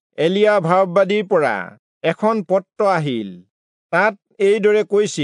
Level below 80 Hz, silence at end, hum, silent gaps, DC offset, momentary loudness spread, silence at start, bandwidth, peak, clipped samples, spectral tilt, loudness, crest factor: -76 dBFS; 0 s; none; 1.79-2.01 s, 3.50-3.90 s; under 0.1%; 9 LU; 0.2 s; 10.5 kHz; -2 dBFS; under 0.1%; -5.5 dB/octave; -17 LUFS; 16 dB